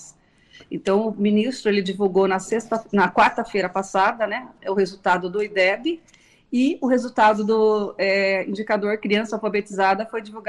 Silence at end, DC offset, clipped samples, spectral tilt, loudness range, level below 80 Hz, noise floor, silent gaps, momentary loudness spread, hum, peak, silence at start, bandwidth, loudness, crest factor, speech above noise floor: 0 s; under 0.1%; under 0.1%; -5.5 dB/octave; 2 LU; -60 dBFS; -52 dBFS; none; 8 LU; none; -8 dBFS; 0 s; 11 kHz; -21 LUFS; 14 dB; 31 dB